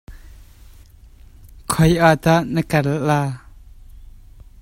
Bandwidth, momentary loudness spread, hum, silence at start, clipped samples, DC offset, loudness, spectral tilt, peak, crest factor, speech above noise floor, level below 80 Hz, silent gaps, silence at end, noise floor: 16 kHz; 13 LU; none; 0.1 s; under 0.1%; under 0.1%; -17 LUFS; -6 dB/octave; 0 dBFS; 20 dB; 28 dB; -40 dBFS; none; 0.55 s; -44 dBFS